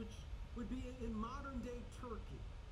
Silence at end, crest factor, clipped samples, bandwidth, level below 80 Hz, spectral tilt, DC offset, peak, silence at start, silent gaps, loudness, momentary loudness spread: 0 s; 14 dB; under 0.1%; 12 kHz; -50 dBFS; -6.5 dB/octave; under 0.1%; -34 dBFS; 0 s; none; -49 LUFS; 7 LU